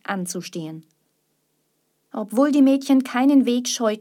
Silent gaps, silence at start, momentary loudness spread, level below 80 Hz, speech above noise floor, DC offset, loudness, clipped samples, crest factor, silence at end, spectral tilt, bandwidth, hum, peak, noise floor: none; 0.1 s; 18 LU; -80 dBFS; 50 dB; under 0.1%; -19 LUFS; under 0.1%; 14 dB; 0 s; -4.5 dB/octave; 16 kHz; none; -6 dBFS; -70 dBFS